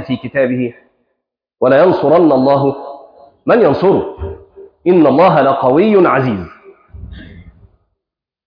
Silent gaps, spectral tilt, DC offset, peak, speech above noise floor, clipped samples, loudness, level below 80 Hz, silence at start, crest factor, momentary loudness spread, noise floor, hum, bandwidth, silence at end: none; -10 dB/octave; under 0.1%; 0 dBFS; 70 dB; under 0.1%; -12 LUFS; -42 dBFS; 0 s; 12 dB; 18 LU; -81 dBFS; none; 5.2 kHz; 1.05 s